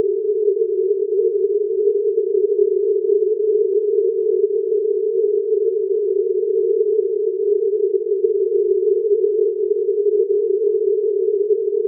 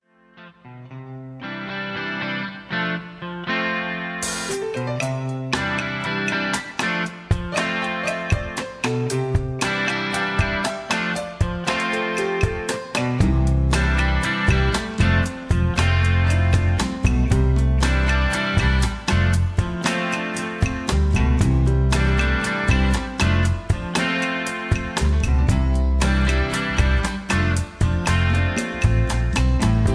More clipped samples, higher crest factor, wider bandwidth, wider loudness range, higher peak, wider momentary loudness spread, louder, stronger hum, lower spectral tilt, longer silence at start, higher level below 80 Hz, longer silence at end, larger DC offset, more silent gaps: neither; about the same, 12 dB vs 16 dB; second, 0.5 kHz vs 11 kHz; second, 1 LU vs 5 LU; about the same, -4 dBFS vs -4 dBFS; second, 2 LU vs 7 LU; first, -18 LUFS vs -21 LUFS; neither; second, -2.5 dB/octave vs -5.5 dB/octave; second, 0 s vs 0.4 s; second, under -90 dBFS vs -26 dBFS; about the same, 0 s vs 0 s; neither; neither